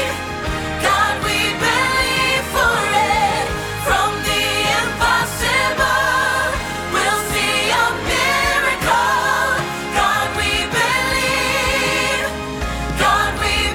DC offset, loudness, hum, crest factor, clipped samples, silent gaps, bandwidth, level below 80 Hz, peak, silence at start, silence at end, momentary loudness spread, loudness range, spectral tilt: under 0.1%; -17 LUFS; none; 14 dB; under 0.1%; none; 20 kHz; -32 dBFS; -4 dBFS; 0 s; 0 s; 5 LU; 1 LU; -2.5 dB/octave